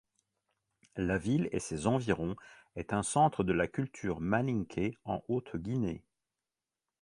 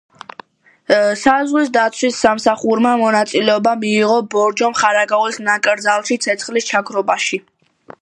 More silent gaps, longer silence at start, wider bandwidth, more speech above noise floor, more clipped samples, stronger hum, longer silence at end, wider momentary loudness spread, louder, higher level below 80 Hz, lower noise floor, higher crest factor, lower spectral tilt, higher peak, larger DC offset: neither; about the same, 0.95 s vs 0.9 s; about the same, 11.5 kHz vs 11.5 kHz; first, over 57 dB vs 27 dB; neither; neither; first, 1 s vs 0.6 s; first, 11 LU vs 4 LU; second, -33 LUFS vs -15 LUFS; about the same, -56 dBFS vs -60 dBFS; first, under -90 dBFS vs -42 dBFS; about the same, 20 dB vs 16 dB; first, -6 dB/octave vs -3 dB/octave; second, -14 dBFS vs 0 dBFS; neither